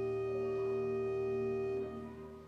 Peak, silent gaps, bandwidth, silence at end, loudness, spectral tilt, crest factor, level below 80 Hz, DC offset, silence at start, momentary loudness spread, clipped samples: -28 dBFS; none; 6.6 kHz; 0 s; -37 LUFS; -8.5 dB/octave; 10 dB; -62 dBFS; under 0.1%; 0 s; 8 LU; under 0.1%